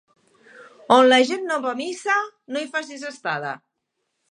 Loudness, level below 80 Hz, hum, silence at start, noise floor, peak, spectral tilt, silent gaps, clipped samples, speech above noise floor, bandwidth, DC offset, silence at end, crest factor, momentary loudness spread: -21 LUFS; -76 dBFS; none; 0.55 s; -77 dBFS; 0 dBFS; -3 dB/octave; none; under 0.1%; 56 dB; 10.5 kHz; under 0.1%; 0.75 s; 22 dB; 16 LU